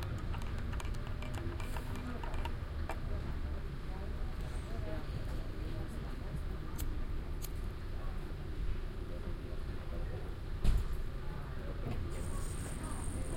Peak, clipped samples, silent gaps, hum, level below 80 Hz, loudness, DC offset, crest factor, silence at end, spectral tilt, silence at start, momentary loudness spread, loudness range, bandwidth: -16 dBFS; under 0.1%; none; none; -40 dBFS; -42 LUFS; under 0.1%; 20 dB; 0 s; -6 dB/octave; 0 s; 3 LU; 2 LU; 16.5 kHz